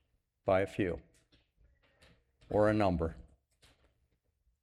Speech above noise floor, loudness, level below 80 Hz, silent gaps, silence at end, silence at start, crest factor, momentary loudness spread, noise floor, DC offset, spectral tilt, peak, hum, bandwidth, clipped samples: 46 dB; -33 LUFS; -54 dBFS; none; 1.4 s; 0.45 s; 22 dB; 11 LU; -77 dBFS; under 0.1%; -8 dB/octave; -16 dBFS; none; 12 kHz; under 0.1%